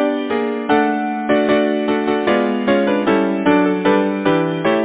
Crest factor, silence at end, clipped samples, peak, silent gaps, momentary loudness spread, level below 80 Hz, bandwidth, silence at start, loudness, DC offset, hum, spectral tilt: 14 dB; 0 s; under 0.1%; -2 dBFS; none; 4 LU; -52 dBFS; 4 kHz; 0 s; -16 LUFS; under 0.1%; none; -10 dB/octave